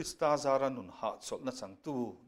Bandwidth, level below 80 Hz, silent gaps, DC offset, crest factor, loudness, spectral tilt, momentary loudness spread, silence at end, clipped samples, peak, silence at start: 15.5 kHz; -68 dBFS; none; under 0.1%; 18 dB; -35 LUFS; -4.5 dB/octave; 11 LU; 0.1 s; under 0.1%; -16 dBFS; 0 s